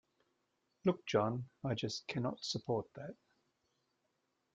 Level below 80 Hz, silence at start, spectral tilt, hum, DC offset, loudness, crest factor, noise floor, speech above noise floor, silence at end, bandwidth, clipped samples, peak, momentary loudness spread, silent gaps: -76 dBFS; 0.85 s; -5.5 dB/octave; none; under 0.1%; -38 LUFS; 20 dB; -83 dBFS; 45 dB; 1.4 s; 9.2 kHz; under 0.1%; -20 dBFS; 11 LU; none